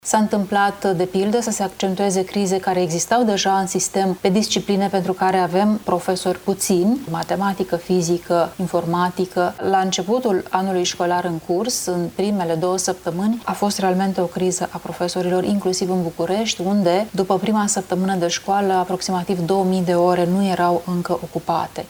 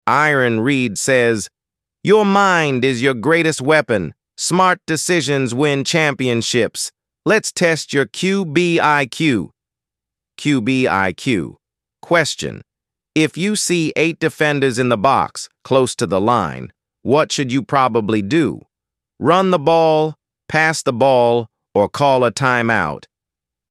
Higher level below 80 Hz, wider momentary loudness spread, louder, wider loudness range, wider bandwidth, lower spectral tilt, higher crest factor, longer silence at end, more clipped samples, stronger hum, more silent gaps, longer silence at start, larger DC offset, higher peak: about the same, -54 dBFS vs -56 dBFS; second, 5 LU vs 9 LU; second, -20 LUFS vs -16 LUFS; about the same, 2 LU vs 4 LU; first, over 20 kHz vs 14.5 kHz; about the same, -4.5 dB/octave vs -4.5 dB/octave; about the same, 16 dB vs 16 dB; second, 0 s vs 0.7 s; neither; neither; neither; about the same, 0.05 s vs 0.05 s; neither; about the same, -4 dBFS vs -2 dBFS